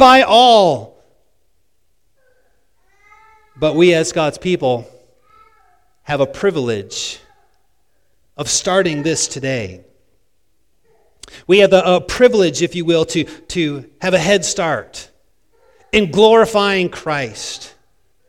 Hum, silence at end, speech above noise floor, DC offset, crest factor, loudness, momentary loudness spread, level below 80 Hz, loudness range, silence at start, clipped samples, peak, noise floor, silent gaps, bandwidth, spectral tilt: none; 0.6 s; 53 dB; 0.2%; 16 dB; -15 LUFS; 14 LU; -48 dBFS; 7 LU; 0 s; 0.1%; 0 dBFS; -67 dBFS; none; 15.5 kHz; -4 dB/octave